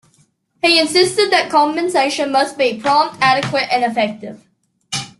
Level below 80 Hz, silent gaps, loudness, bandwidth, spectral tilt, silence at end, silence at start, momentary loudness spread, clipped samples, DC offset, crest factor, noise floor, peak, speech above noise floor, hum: -60 dBFS; none; -15 LUFS; 12.5 kHz; -3 dB/octave; 0.15 s; 0.65 s; 9 LU; under 0.1%; under 0.1%; 16 dB; -58 dBFS; 0 dBFS; 42 dB; none